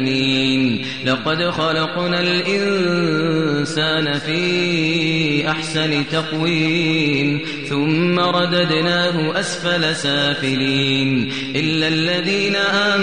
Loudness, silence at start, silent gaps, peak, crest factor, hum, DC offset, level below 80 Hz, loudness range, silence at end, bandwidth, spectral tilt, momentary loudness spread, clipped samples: -17 LUFS; 0 s; none; -6 dBFS; 12 dB; none; 0.7%; -54 dBFS; 1 LU; 0 s; 10 kHz; -5 dB/octave; 4 LU; under 0.1%